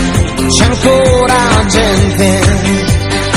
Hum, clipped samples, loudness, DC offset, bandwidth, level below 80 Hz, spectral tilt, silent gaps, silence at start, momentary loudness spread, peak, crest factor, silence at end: none; 0.7%; -9 LUFS; under 0.1%; 15.5 kHz; -20 dBFS; -4.5 dB/octave; none; 0 s; 4 LU; 0 dBFS; 10 dB; 0 s